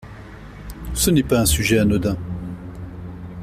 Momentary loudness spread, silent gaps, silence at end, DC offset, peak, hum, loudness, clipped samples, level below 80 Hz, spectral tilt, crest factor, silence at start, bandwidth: 22 LU; none; 0 s; under 0.1%; -4 dBFS; none; -19 LUFS; under 0.1%; -34 dBFS; -4.5 dB/octave; 18 dB; 0 s; 16 kHz